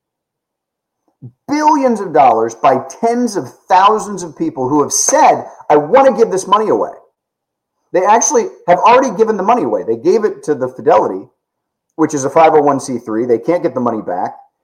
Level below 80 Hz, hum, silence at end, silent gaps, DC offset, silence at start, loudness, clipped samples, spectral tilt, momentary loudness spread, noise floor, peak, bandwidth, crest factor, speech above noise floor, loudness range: -62 dBFS; none; 0.25 s; none; under 0.1%; 1.25 s; -13 LUFS; under 0.1%; -4 dB/octave; 10 LU; -78 dBFS; 0 dBFS; 16 kHz; 14 dB; 66 dB; 3 LU